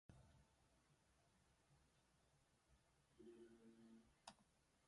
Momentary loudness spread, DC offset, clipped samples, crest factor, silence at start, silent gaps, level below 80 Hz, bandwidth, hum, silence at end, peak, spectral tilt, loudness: 3 LU; under 0.1%; under 0.1%; 30 dB; 0.1 s; none; -84 dBFS; 11 kHz; none; 0 s; -42 dBFS; -4.5 dB/octave; -68 LUFS